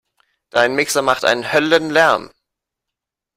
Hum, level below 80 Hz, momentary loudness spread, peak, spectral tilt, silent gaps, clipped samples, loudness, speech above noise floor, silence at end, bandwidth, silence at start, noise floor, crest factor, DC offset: none; -60 dBFS; 4 LU; 0 dBFS; -3 dB/octave; none; under 0.1%; -16 LUFS; 68 dB; 1.1 s; 16 kHz; 0.55 s; -83 dBFS; 18 dB; under 0.1%